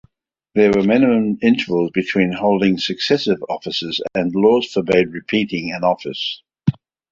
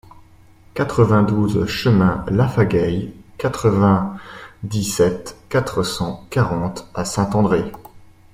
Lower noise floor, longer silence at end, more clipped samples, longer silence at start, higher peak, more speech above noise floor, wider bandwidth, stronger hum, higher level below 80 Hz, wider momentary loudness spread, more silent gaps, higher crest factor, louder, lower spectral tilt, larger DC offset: first, -57 dBFS vs -47 dBFS; about the same, 0.4 s vs 0.35 s; neither; second, 0.55 s vs 0.75 s; about the same, -2 dBFS vs -2 dBFS; first, 40 dB vs 29 dB; second, 7.6 kHz vs 16 kHz; neither; second, -52 dBFS vs -42 dBFS; second, 9 LU vs 12 LU; neither; about the same, 16 dB vs 18 dB; about the same, -18 LUFS vs -19 LUFS; about the same, -6.5 dB/octave vs -6.5 dB/octave; neither